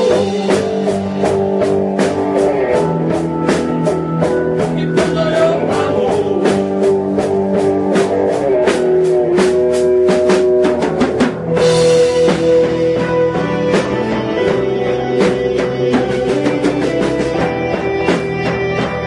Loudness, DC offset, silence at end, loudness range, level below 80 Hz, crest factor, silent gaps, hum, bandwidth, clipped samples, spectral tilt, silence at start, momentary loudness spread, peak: -14 LUFS; under 0.1%; 0 s; 3 LU; -42 dBFS; 14 dB; none; none; 11.5 kHz; under 0.1%; -6 dB/octave; 0 s; 5 LU; 0 dBFS